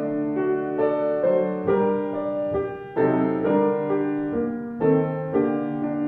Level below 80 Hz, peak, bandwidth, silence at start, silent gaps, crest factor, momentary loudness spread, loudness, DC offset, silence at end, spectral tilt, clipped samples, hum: -56 dBFS; -8 dBFS; 4.3 kHz; 0 s; none; 14 dB; 5 LU; -23 LUFS; under 0.1%; 0 s; -11 dB/octave; under 0.1%; none